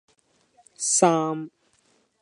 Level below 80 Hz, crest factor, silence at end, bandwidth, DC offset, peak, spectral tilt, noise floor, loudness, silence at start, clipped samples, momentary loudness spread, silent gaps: -78 dBFS; 24 dB; 0.75 s; 11.5 kHz; under 0.1%; -4 dBFS; -3.5 dB/octave; -65 dBFS; -22 LUFS; 0.8 s; under 0.1%; 16 LU; none